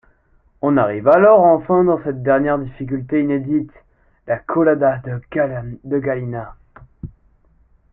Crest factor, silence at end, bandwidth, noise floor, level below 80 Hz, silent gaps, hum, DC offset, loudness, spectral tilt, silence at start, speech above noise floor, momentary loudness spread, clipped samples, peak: 16 dB; 0.85 s; 3.7 kHz; -56 dBFS; -48 dBFS; none; none; under 0.1%; -17 LUFS; -11.5 dB/octave; 0.65 s; 40 dB; 18 LU; under 0.1%; -2 dBFS